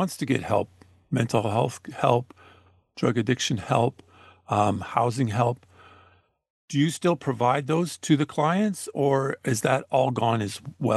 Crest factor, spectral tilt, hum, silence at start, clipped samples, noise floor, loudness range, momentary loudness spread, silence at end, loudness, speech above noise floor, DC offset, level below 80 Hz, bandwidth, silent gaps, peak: 20 dB; -6 dB/octave; none; 0 s; under 0.1%; -60 dBFS; 3 LU; 5 LU; 0 s; -25 LUFS; 35 dB; under 0.1%; -64 dBFS; 12.5 kHz; 6.50-6.68 s; -4 dBFS